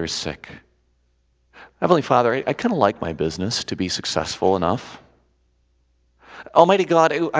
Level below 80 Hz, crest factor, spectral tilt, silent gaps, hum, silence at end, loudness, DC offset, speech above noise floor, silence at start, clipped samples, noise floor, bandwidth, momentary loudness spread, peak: -48 dBFS; 22 dB; -5 dB/octave; none; none; 0 s; -20 LUFS; under 0.1%; 44 dB; 0 s; under 0.1%; -64 dBFS; 8 kHz; 13 LU; 0 dBFS